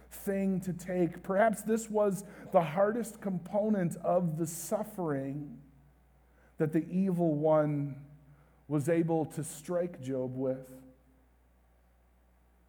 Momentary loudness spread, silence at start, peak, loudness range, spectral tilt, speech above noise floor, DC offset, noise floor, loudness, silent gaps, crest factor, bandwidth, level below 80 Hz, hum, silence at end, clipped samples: 9 LU; 0.1 s; -14 dBFS; 4 LU; -7 dB/octave; 34 dB; under 0.1%; -65 dBFS; -32 LUFS; none; 20 dB; over 20 kHz; -64 dBFS; none; 1.8 s; under 0.1%